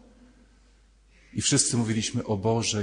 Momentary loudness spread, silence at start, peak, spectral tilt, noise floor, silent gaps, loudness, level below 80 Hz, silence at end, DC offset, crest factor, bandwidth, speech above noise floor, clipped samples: 6 LU; 1.35 s; -8 dBFS; -3.5 dB/octave; -58 dBFS; none; -25 LUFS; -56 dBFS; 0 s; under 0.1%; 20 dB; 10 kHz; 33 dB; under 0.1%